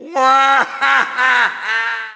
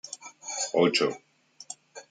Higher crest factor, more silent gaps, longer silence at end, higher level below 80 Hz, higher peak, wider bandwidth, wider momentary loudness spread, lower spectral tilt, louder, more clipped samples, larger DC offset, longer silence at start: second, 14 dB vs 22 dB; neither; about the same, 0 s vs 0.1 s; first, -68 dBFS vs -78 dBFS; first, 0 dBFS vs -8 dBFS; second, 8 kHz vs 9.6 kHz; second, 6 LU vs 20 LU; second, -0.5 dB/octave vs -3 dB/octave; first, -13 LUFS vs -26 LUFS; neither; neither; about the same, 0 s vs 0.05 s